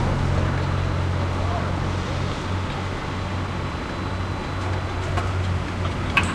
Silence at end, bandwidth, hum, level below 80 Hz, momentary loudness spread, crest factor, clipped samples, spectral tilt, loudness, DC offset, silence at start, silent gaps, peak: 0 s; 10.5 kHz; none; -34 dBFS; 5 LU; 20 dB; under 0.1%; -6 dB/octave; -25 LUFS; under 0.1%; 0 s; none; -4 dBFS